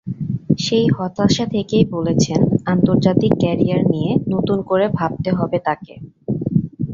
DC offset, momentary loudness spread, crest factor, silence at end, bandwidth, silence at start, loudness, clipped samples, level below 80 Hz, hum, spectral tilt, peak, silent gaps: under 0.1%; 8 LU; 16 dB; 0 s; 7.6 kHz; 0.05 s; -18 LUFS; under 0.1%; -44 dBFS; none; -6.5 dB/octave; 0 dBFS; none